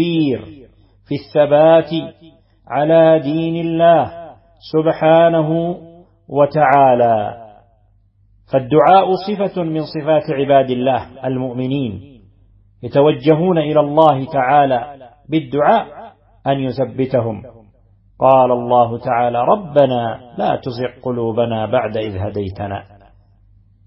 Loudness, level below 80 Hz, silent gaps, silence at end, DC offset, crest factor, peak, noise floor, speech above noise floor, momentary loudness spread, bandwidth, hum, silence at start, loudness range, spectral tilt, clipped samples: -15 LUFS; -52 dBFS; none; 1.05 s; under 0.1%; 16 dB; 0 dBFS; -54 dBFS; 39 dB; 13 LU; 5.8 kHz; none; 0 s; 4 LU; -10 dB/octave; under 0.1%